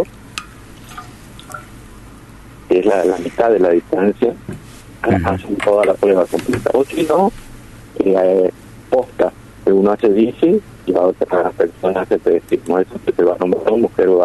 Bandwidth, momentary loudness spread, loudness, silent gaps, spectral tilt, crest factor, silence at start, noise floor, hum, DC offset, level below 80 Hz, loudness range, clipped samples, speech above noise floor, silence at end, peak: 12.5 kHz; 17 LU; -16 LUFS; none; -7 dB/octave; 14 dB; 0 s; -38 dBFS; none; under 0.1%; -44 dBFS; 2 LU; under 0.1%; 23 dB; 0 s; -4 dBFS